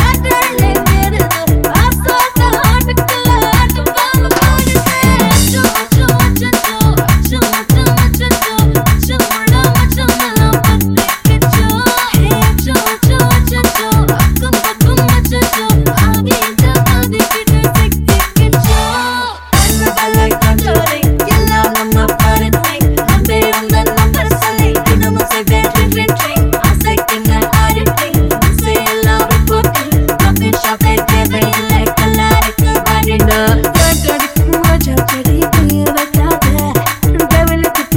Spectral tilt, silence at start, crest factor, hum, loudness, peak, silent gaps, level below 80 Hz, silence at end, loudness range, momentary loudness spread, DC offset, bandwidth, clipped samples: -5 dB/octave; 0 s; 10 dB; none; -11 LUFS; 0 dBFS; none; -16 dBFS; 0 s; 1 LU; 3 LU; 0.4%; 17.5 kHz; under 0.1%